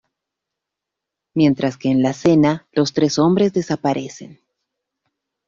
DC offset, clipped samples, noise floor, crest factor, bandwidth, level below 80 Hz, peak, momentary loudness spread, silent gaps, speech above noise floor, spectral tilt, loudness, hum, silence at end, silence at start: under 0.1%; under 0.1%; -83 dBFS; 16 dB; 7.6 kHz; -56 dBFS; -4 dBFS; 10 LU; none; 66 dB; -6.5 dB/octave; -18 LUFS; none; 1.15 s; 1.35 s